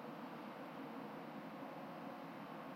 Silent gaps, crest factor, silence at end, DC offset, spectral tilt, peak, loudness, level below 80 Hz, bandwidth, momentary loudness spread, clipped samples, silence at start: none; 12 dB; 0 s; under 0.1%; -6.5 dB/octave; -38 dBFS; -51 LUFS; under -90 dBFS; 16 kHz; 1 LU; under 0.1%; 0 s